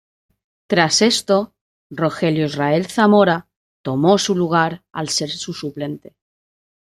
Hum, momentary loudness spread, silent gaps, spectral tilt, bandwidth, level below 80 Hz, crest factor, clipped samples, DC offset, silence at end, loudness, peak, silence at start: none; 14 LU; 1.61-1.90 s, 3.56-3.84 s; -4.5 dB/octave; 14 kHz; -60 dBFS; 18 dB; under 0.1%; under 0.1%; 1 s; -18 LUFS; -2 dBFS; 0.7 s